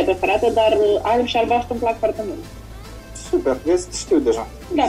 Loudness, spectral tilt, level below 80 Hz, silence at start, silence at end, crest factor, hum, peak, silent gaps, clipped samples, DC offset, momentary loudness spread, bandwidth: -19 LUFS; -4.5 dB/octave; -40 dBFS; 0 s; 0 s; 14 dB; none; -4 dBFS; none; under 0.1%; under 0.1%; 19 LU; 15.5 kHz